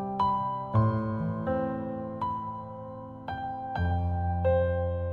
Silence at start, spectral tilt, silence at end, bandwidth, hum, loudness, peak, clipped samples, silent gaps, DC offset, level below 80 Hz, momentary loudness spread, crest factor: 0 s; -10 dB/octave; 0 s; 4.5 kHz; none; -30 LUFS; -14 dBFS; under 0.1%; none; under 0.1%; -50 dBFS; 12 LU; 16 dB